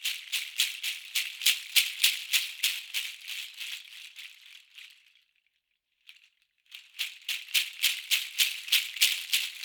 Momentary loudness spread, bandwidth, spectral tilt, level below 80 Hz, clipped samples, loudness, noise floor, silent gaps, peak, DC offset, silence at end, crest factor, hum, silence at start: 19 LU; over 20 kHz; 10 dB/octave; under -90 dBFS; under 0.1%; -27 LUFS; -79 dBFS; none; -4 dBFS; under 0.1%; 0 s; 28 dB; none; 0 s